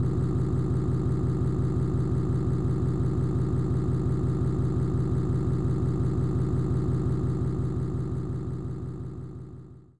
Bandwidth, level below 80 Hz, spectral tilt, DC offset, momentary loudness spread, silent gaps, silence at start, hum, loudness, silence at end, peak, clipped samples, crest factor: 8.6 kHz; -40 dBFS; -10 dB/octave; 1%; 8 LU; none; 0 s; none; -28 LUFS; 0 s; -16 dBFS; under 0.1%; 10 dB